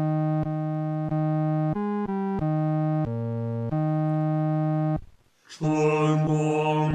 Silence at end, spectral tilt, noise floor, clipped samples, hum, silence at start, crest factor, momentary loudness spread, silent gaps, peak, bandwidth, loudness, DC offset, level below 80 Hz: 0 s; -8.5 dB/octave; -51 dBFS; under 0.1%; none; 0 s; 14 dB; 6 LU; none; -10 dBFS; 8.4 kHz; -26 LUFS; under 0.1%; -54 dBFS